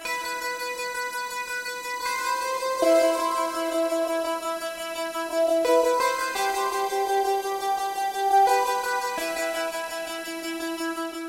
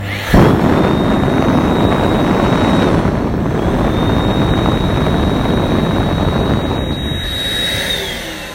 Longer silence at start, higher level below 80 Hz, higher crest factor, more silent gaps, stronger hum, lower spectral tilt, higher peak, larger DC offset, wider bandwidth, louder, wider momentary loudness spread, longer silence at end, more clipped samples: about the same, 0 s vs 0 s; second, -64 dBFS vs -24 dBFS; about the same, 16 dB vs 14 dB; neither; neither; second, -1 dB/octave vs -6.5 dB/octave; second, -8 dBFS vs 0 dBFS; neither; about the same, 16 kHz vs 16.5 kHz; second, -25 LUFS vs -14 LUFS; first, 10 LU vs 5 LU; about the same, 0 s vs 0 s; neither